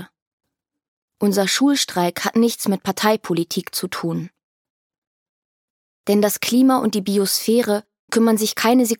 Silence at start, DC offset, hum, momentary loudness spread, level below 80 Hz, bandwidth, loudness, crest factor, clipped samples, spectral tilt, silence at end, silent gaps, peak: 0 s; under 0.1%; none; 8 LU; -68 dBFS; 17.5 kHz; -19 LUFS; 18 dB; under 0.1%; -4 dB/octave; 0.05 s; 0.22-0.38 s, 0.88-1.08 s, 4.43-4.90 s, 4.98-6.04 s, 7.99-8.08 s; -2 dBFS